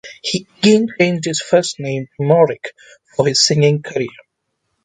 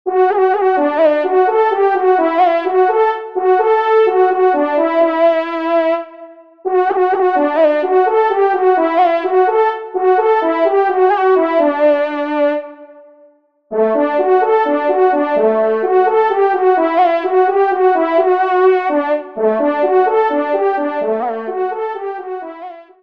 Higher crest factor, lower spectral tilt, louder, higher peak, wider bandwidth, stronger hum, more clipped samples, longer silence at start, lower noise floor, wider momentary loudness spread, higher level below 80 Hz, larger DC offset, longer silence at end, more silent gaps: about the same, 16 dB vs 12 dB; second, -4.5 dB/octave vs -6.5 dB/octave; about the same, -16 LUFS vs -14 LUFS; about the same, 0 dBFS vs -2 dBFS; first, 9.6 kHz vs 5.4 kHz; neither; neither; about the same, 0.05 s vs 0.05 s; first, -72 dBFS vs -50 dBFS; first, 12 LU vs 7 LU; first, -58 dBFS vs -68 dBFS; second, under 0.1% vs 0.3%; first, 0.75 s vs 0.2 s; neither